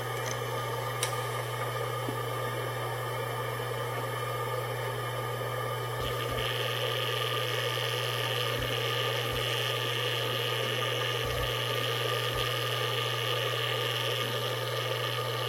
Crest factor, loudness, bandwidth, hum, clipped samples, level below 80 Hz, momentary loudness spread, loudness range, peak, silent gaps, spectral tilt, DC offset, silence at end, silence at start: 18 dB; -31 LUFS; 16 kHz; none; under 0.1%; -54 dBFS; 4 LU; 4 LU; -12 dBFS; none; -3.5 dB/octave; under 0.1%; 0 s; 0 s